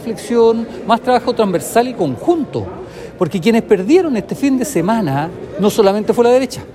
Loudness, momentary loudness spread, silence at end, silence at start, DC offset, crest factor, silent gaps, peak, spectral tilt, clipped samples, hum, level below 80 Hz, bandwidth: -15 LUFS; 9 LU; 0 s; 0 s; under 0.1%; 14 dB; none; 0 dBFS; -6 dB/octave; under 0.1%; none; -48 dBFS; 15.5 kHz